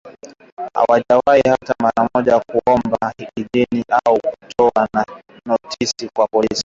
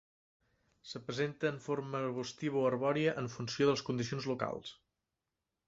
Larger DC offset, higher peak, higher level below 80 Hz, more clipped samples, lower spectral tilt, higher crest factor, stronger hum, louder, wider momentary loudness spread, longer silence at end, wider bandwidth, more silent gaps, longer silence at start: neither; first, -2 dBFS vs -16 dBFS; first, -52 dBFS vs -72 dBFS; neither; about the same, -4.5 dB/octave vs -5 dB/octave; second, 14 dB vs 20 dB; neither; first, -17 LUFS vs -36 LUFS; about the same, 10 LU vs 10 LU; second, 0.05 s vs 0.95 s; about the same, 7.8 kHz vs 7.8 kHz; first, 0.52-0.57 s vs none; second, 0.05 s vs 0.85 s